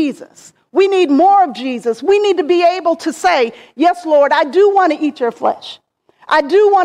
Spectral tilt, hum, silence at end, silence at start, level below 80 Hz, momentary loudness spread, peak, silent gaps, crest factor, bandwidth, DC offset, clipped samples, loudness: -3.5 dB/octave; none; 0 s; 0 s; -60 dBFS; 9 LU; -2 dBFS; none; 12 dB; 11.5 kHz; under 0.1%; under 0.1%; -13 LUFS